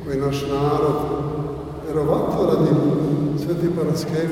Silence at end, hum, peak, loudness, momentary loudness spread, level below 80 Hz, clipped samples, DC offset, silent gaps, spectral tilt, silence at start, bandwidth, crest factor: 0 s; none; -4 dBFS; -21 LUFS; 8 LU; -42 dBFS; under 0.1%; under 0.1%; none; -7.5 dB/octave; 0 s; 16 kHz; 16 dB